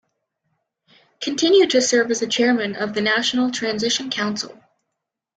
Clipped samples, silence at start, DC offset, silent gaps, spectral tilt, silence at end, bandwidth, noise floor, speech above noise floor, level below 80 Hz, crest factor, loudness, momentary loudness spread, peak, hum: under 0.1%; 1.2 s; under 0.1%; none; -2.5 dB/octave; 0.85 s; 9.4 kHz; -81 dBFS; 61 dB; -66 dBFS; 16 dB; -19 LUFS; 10 LU; -4 dBFS; none